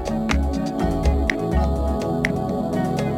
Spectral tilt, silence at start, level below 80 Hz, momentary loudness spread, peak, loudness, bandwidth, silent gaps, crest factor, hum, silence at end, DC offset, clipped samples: -7 dB/octave; 0 s; -26 dBFS; 3 LU; -2 dBFS; -22 LUFS; 13.5 kHz; none; 20 dB; none; 0 s; under 0.1%; under 0.1%